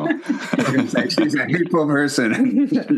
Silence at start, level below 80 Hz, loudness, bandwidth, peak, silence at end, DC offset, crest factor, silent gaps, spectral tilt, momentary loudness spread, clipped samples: 0 s; -70 dBFS; -19 LUFS; 12.5 kHz; -4 dBFS; 0 s; under 0.1%; 14 dB; none; -5.5 dB/octave; 4 LU; under 0.1%